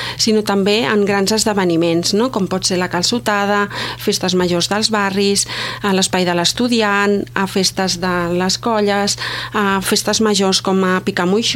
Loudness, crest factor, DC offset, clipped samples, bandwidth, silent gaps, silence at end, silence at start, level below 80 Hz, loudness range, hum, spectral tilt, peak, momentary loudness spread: -16 LUFS; 16 dB; under 0.1%; under 0.1%; 16.5 kHz; none; 0 s; 0 s; -46 dBFS; 1 LU; none; -3.5 dB/octave; 0 dBFS; 4 LU